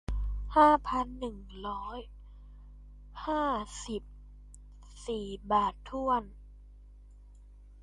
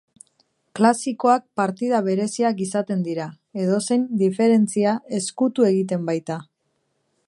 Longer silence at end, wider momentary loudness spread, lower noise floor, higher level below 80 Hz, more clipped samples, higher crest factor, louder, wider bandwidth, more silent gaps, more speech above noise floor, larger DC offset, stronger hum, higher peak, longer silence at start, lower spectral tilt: second, 0 s vs 0.85 s; first, 19 LU vs 9 LU; second, -53 dBFS vs -71 dBFS; first, -44 dBFS vs -72 dBFS; neither; about the same, 22 dB vs 20 dB; second, -31 LUFS vs -21 LUFS; about the same, 11.5 kHz vs 11.5 kHz; neither; second, 22 dB vs 51 dB; neither; first, 50 Hz at -50 dBFS vs none; second, -12 dBFS vs -2 dBFS; second, 0.1 s vs 0.75 s; about the same, -5.5 dB/octave vs -6 dB/octave